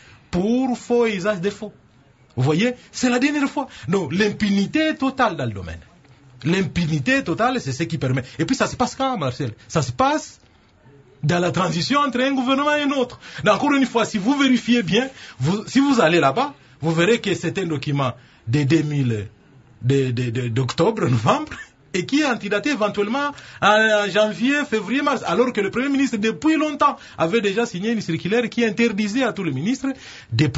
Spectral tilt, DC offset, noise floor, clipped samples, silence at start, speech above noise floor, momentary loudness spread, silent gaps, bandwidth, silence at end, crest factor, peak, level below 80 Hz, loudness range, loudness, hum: -5.5 dB/octave; under 0.1%; -53 dBFS; under 0.1%; 0.35 s; 33 dB; 9 LU; none; 8 kHz; 0 s; 18 dB; -2 dBFS; -50 dBFS; 3 LU; -20 LUFS; none